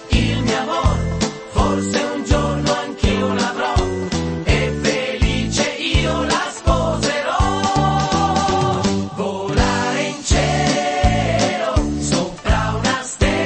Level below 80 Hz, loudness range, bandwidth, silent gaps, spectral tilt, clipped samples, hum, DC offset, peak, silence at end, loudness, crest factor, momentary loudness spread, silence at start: -26 dBFS; 1 LU; 8.8 kHz; none; -5 dB/octave; under 0.1%; none; under 0.1%; -2 dBFS; 0 s; -18 LUFS; 16 dB; 3 LU; 0 s